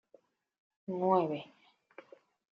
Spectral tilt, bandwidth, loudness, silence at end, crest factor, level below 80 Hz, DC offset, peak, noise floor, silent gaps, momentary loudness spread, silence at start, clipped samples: -6.5 dB/octave; 5.4 kHz; -33 LUFS; 1.1 s; 22 dB; -86 dBFS; under 0.1%; -14 dBFS; -67 dBFS; none; 26 LU; 0.9 s; under 0.1%